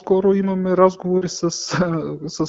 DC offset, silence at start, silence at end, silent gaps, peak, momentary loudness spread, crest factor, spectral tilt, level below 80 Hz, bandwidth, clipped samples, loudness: under 0.1%; 0.05 s; 0 s; none; 0 dBFS; 7 LU; 18 dB; -6 dB/octave; -52 dBFS; 8 kHz; under 0.1%; -19 LUFS